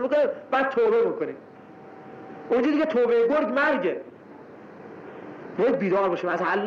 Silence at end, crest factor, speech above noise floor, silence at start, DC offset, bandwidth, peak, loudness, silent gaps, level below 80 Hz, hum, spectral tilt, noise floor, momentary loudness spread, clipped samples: 0 s; 10 dB; 22 dB; 0 s; under 0.1%; 6.8 kHz; -16 dBFS; -23 LUFS; none; -68 dBFS; none; -7 dB/octave; -45 dBFS; 22 LU; under 0.1%